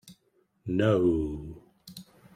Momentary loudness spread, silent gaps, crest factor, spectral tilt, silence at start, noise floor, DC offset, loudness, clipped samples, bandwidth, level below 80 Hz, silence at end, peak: 24 LU; none; 18 dB; -8 dB/octave; 0.05 s; -70 dBFS; under 0.1%; -27 LUFS; under 0.1%; 15.5 kHz; -50 dBFS; 0.35 s; -12 dBFS